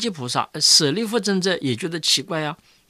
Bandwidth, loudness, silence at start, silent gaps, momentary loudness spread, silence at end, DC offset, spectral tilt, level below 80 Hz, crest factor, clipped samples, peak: 15.5 kHz; -19 LUFS; 0 s; none; 12 LU; 0.35 s; under 0.1%; -2.5 dB/octave; -68 dBFS; 18 dB; under 0.1%; -4 dBFS